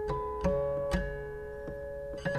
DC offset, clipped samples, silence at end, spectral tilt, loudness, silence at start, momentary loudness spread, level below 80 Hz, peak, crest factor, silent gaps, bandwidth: under 0.1%; under 0.1%; 0 s; -7 dB/octave; -35 LUFS; 0 s; 10 LU; -42 dBFS; -18 dBFS; 16 dB; none; 14 kHz